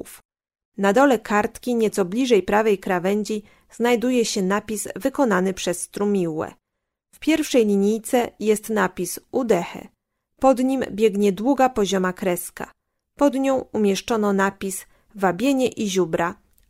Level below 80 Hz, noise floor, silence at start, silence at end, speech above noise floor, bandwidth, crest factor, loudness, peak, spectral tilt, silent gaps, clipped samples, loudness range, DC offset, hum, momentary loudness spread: -54 dBFS; -81 dBFS; 0.05 s; 0.35 s; 60 dB; 16 kHz; 18 dB; -21 LUFS; -4 dBFS; -5 dB/octave; 0.25-0.29 s, 0.65-0.72 s; under 0.1%; 2 LU; under 0.1%; none; 10 LU